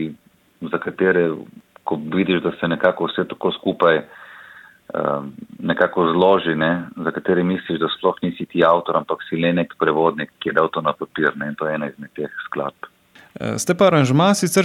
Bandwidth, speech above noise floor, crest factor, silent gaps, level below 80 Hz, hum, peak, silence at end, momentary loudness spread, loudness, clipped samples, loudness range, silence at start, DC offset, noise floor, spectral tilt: 16 kHz; 25 dB; 18 dB; none; -60 dBFS; none; -2 dBFS; 0 s; 14 LU; -20 LUFS; under 0.1%; 3 LU; 0 s; under 0.1%; -44 dBFS; -5.5 dB/octave